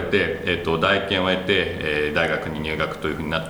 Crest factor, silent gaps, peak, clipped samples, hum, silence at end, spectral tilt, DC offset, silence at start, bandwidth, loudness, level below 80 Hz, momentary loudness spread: 18 dB; none; -4 dBFS; under 0.1%; none; 0 s; -5.5 dB/octave; under 0.1%; 0 s; over 20 kHz; -22 LUFS; -44 dBFS; 6 LU